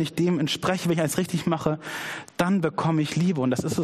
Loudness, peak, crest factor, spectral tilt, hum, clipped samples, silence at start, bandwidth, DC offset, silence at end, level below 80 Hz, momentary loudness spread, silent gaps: -25 LUFS; -6 dBFS; 18 dB; -5.5 dB/octave; none; under 0.1%; 0 s; 15 kHz; under 0.1%; 0 s; -58 dBFS; 6 LU; none